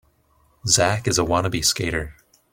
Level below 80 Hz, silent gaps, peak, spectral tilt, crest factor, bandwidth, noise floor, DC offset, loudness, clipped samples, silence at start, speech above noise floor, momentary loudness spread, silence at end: -44 dBFS; none; -2 dBFS; -3 dB/octave; 20 dB; 16.5 kHz; -61 dBFS; under 0.1%; -20 LUFS; under 0.1%; 0.65 s; 40 dB; 12 LU; 0.4 s